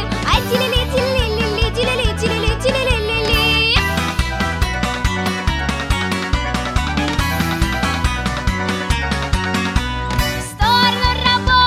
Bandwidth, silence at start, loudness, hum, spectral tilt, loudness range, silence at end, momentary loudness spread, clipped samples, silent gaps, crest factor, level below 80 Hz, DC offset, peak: 16 kHz; 0 s; -17 LUFS; none; -4.5 dB/octave; 3 LU; 0 s; 6 LU; under 0.1%; none; 16 dB; -24 dBFS; 0.2%; 0 dBFS